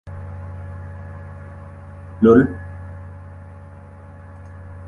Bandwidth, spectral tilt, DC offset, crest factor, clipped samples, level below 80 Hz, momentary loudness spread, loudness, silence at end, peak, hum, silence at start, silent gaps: 6.6 kHz; -10 dB/octave; under 0.1%; 22 dB; under 0.1%; -40 dBFS; 27 LU; -15 LUFS; 0 s; -2 dBFS; none; 0.05 s; none